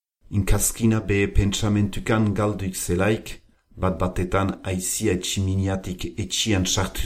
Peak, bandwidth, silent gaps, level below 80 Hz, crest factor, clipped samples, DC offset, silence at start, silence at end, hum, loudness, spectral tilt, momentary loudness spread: -4 dBFS; 16 kHz; none; -32 dBFS; 18 dB; under 0.1%; under 0.1%; 0.3 s; 0 s; none; -23 LUFS; -4.5 dB/octave; 7 LU